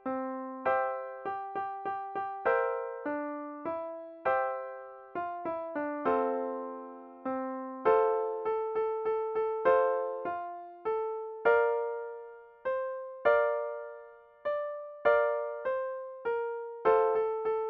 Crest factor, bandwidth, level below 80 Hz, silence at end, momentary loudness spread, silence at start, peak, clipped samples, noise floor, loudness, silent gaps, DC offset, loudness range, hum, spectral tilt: 18 dB; 4.6 kHz; -72 dBFS; 0 s; 13 LU; 0.05 s; -14 dBFS; under 0.1%; -52 dBFS; -32 LUFS; none; under 0.1%; 4 LU; none; -3 dB/octave